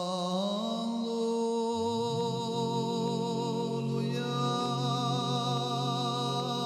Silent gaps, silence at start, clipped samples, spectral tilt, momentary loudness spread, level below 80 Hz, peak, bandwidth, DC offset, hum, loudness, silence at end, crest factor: none; 0 s; under 0.1%; -6 dB/octave; 2 LU; -74 dBFS; -18 dBFS; 13.5 kHz; under 0.1%; none; -31 LUFS; 0 s; 12 dB